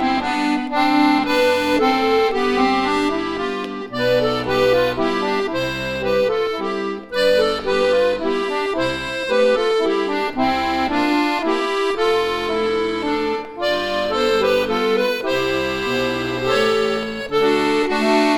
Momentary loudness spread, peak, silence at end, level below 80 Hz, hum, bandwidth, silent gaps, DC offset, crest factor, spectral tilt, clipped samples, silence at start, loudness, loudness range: 6 LU; -4 dBFS; 0 s; -46 dBFS; none; 17 kHz; none; under 0.1%; 14 dB; -4.5 dB/octave; under 0.1%; 0 s; -19 LUFS; 2 LU